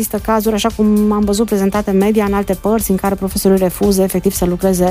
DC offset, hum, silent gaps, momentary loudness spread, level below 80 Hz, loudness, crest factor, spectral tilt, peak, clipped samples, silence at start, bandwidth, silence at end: under 0.1%; none; none; 3 LU; -32 dBFS; -14 LUFS; 12 dB; -5.5 dB/octave; -2 dBFS; under 0.1%; 0 s; 16 kHz; 0 s